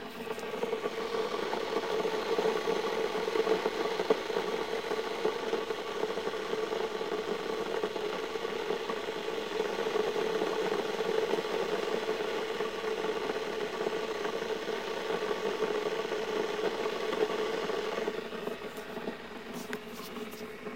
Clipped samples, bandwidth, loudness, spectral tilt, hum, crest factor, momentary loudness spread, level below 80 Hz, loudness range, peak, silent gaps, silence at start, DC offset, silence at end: under 0.1%; 16 kHz; -33 LUFS; -3.5 dB/octave; none; 20 dB; 8 LU; -66 dBFS; 3 LU; -12 dBFS; none; 0 s; 0.2%; 0 s